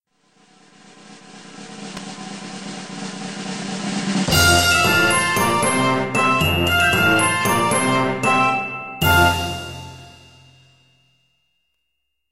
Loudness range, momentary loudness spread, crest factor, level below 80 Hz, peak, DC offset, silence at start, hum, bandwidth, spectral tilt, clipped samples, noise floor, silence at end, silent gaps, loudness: 15 LU; 18 LU; 18 dB; -42 dBFS; -2 dBFS; under 0.1%; 1.05 s; none; 16 kHz; -3.5 dB/octave; under 0.1%; -76 dBFS; 2.05 s; none; -17 LUFS